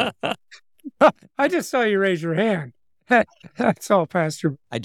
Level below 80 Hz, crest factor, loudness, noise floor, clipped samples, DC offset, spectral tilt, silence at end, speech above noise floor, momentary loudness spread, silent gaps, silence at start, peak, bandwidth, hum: -64 dBFS; 18 dB; -21 LUFS; -52 dBFS; under 0.1%; under 0.1%; -5.5 dB/octave; 0 s; 30 dB; 10 LU; none; 0 s; -4 dBFS; 17 kHz; none